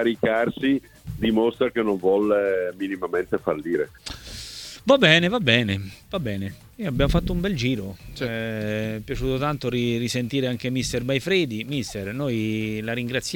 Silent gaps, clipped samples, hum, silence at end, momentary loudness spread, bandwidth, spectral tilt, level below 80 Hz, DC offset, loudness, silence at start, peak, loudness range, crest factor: none; under 0.1%; none; 0 s; 12 LU; 19 kHz; -5.5 dB/octave; -40 dBFS; under 0.1%; -23 LUFS; 0 s; 0 dBFS; 5 LU; 22 dB